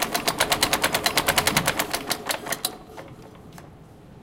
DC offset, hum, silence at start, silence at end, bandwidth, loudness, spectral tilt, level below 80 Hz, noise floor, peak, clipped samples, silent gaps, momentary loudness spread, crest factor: under 0.1%; none; 0 s; 0 s; 17.5 kHz; -23 LUFS; -1.5 dB/octave; -48 dBFS; -46 dBFS; -2 dBFS; under 0.1%; none; 22 LU; 24 dB